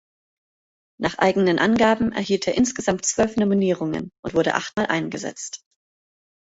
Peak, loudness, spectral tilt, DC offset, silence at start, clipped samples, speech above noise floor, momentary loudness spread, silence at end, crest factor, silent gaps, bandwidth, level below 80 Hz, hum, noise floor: -2 dBFS; -21 LUFS; -4.5 dB/octave; under 0.1%; 1 s; under 0.1%; over 69 dB; 11 LU; 0.9 s; 20 dB; 4.19-4.23 s; 8 kHz; -52 dBFS; none; under -90 dBFS